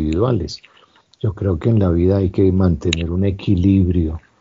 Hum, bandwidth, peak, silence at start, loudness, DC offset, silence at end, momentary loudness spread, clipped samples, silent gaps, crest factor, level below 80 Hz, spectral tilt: none; 7.6 kHz; 0 dBFS; 0 s; -17 LUFS; under 0.1%; 0.2 s; 10 LU; under 0.1%; none; 16 dB; -32 dBFS; -8 dB/octave